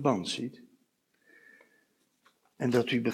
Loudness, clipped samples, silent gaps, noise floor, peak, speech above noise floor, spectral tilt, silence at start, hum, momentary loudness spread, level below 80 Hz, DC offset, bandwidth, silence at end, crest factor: -31 LUFS; under 0.1%; none; -73 dBFS; -12 dBFS; 44 dB; -5.5 dB/octave; 0 s; none; 10 LU; -76 dBFS; under 0.1%; 14.5 kHz; 0 s; 20 dB